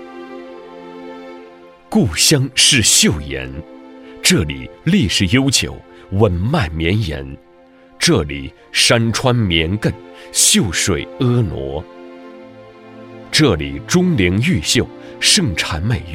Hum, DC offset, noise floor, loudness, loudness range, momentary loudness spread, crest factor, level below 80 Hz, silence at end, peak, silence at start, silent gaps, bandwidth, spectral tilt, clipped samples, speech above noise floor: none; under 0.1%; -45 dBFS; -15 LUFS; 4 LU; 22 LU; 16 dB; -36 dBFS; 0 s; 0 dBFS; 0 s; none; 16.5 kHz; -3.5 dB/octave; under 0.1%; 30 dB